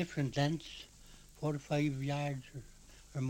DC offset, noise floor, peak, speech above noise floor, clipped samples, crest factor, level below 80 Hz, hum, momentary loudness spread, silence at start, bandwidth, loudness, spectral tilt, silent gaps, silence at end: under 0.1%; -57 dBFS; -20 dBFS; 21 dB; under 0.1%; 18 dB; -60 dBFS; none; 21 LU; 0 s; 16.5 kHz; -37 LUFS; -6.5 dB/octave; none; 0 s